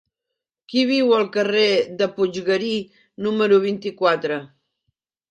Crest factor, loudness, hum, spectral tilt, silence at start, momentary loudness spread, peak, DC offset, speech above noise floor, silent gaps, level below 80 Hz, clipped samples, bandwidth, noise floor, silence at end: 18 dB; -20 LUFS; none; -5 dB/octave; 0.7 s; 10 LU; -4 dBFS; under 0.1%; 64 dB; none; -68 dBFS; under 0.1%; 9 kHz; -83 dBFS; 0.85 s